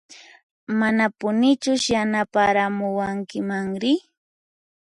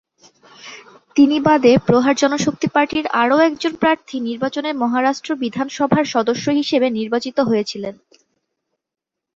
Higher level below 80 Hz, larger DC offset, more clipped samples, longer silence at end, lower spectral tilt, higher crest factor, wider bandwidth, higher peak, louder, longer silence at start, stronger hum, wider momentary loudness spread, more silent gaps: about the same, -58 dBFS vs -56 dBFS; neither; neither; second, 0.85 s vs 1.4 s; about the same, -4.5 dB/octave vs -5 dB/octave; about the same, 16 dB vs 16 dB; first, 11 kHz vs 7.8 kHz; second, -6 dBFS vs -2 dBFS; second, -22 LUFS vs -17 LUFS; second, 0.1 s vs 0.65 s; neither; second, 7 LU vs 10 LU; first, 0.43-0.67 s vs none